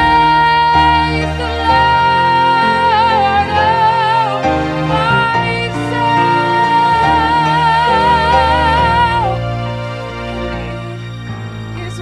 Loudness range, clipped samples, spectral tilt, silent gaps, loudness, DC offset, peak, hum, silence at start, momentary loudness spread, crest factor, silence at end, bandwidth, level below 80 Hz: 3 LU; under 0.1%; -5.5 dB/octave; none; -12 LUFS; under 0.1%; 0 dBFS; none; 0 s; 13 LU; 12 dB; 0 s; 11 kHz; -30 dBFS